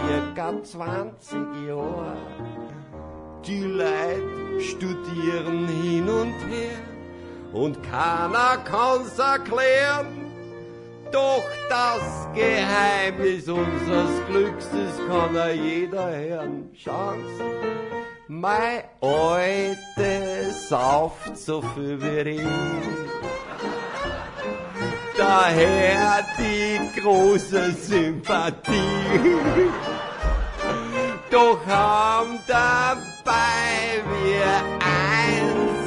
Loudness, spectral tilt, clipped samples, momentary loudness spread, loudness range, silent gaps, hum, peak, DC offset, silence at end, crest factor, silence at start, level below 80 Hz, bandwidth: -23 LUFS; -5 dB/octave; under 0.1%; 14 LU; 8 LU; none; none; -4 dBFS; under 0.1%; 0 s; 18 dB; 0 s; -42 dBFS; 11 kHz